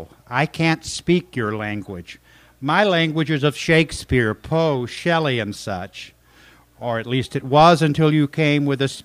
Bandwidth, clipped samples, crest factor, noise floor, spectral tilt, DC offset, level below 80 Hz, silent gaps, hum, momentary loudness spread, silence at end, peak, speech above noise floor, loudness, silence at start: 15 kHz; under 0.1%; 18 dB; -51 dBFS; -6 dB/octave; under 0.1%; -46 dBFS; none; none; 13 LU; 0.05 s; 0 dBFS; 31 dB; -19 LUFS; 0 s